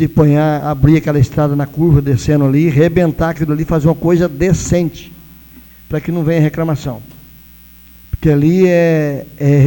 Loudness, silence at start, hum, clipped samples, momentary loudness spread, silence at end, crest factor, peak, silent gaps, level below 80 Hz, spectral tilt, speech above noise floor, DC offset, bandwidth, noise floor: -13 LUFS; 0 s; none; under 0.1%; 9 LU; 0 s; 12 dB; 0 dBFS; none; -32 dBFS; -8 dB/octave; 28 dB; under 0.1%; 18 kHz; -40 dBFS